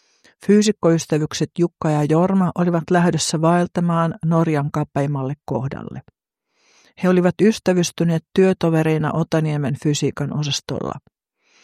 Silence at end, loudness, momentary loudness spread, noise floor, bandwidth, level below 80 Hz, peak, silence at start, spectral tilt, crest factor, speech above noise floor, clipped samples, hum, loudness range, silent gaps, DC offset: 0.65 s; -19 LUFS; 9 LU; -68 dBFS; 14 kHz; -56 dBFS; -4 dBFS; 0.4 s; -6 dB/octave; 16 dB; 50 dB; under 0.1%; none; 4 LU; none; under 0.1%